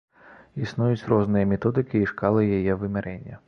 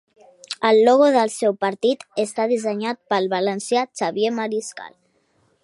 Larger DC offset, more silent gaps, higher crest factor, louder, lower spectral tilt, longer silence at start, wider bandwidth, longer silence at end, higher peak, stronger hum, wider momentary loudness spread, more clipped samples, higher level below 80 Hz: neither; neither; about the same, 18 dB vs 18 dB; second, -24 LUFS vs -20 LUFS; first, -9.5 dB/octave vs -4 dB/octave; second, 0.3 s vs 0.5 s; second, 6.6 kHz vs 11.5 kHz; second, 0.1 s vs 0.75 s; second, -6 dBFS vs -2 dBFS; neither; about the same, 10 LU vs 12 LU; neither; first, -48 dBFS vs -76 dBFS